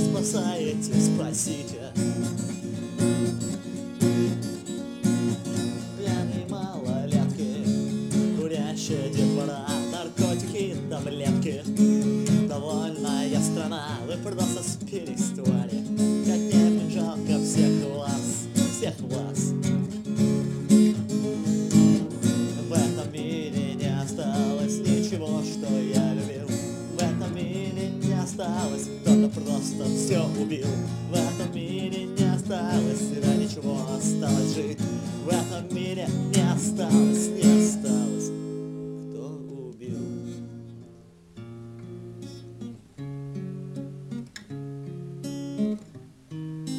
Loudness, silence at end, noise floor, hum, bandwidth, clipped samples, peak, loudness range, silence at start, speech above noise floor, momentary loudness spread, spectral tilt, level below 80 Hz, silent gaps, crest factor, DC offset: -26 LUFS; 0 s; -50 dBFS; none; 15.5 kHz; under 0.1%; -6 dBFS; 13 LU; 0 s; 26 dB; 15 LU; -6 dB/octave; -60 dBFS; none; 20 dB; under 0.1%